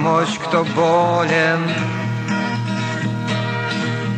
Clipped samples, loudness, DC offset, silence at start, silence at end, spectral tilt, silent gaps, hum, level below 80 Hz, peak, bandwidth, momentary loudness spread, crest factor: under 0.1%; -19 LUFS; under 0.1%; 0 s; 0 s; -6 dB/octave; none; none; -60 dBFS; -4 dBFS; 9.4 kHz; 6 LU; 14 dB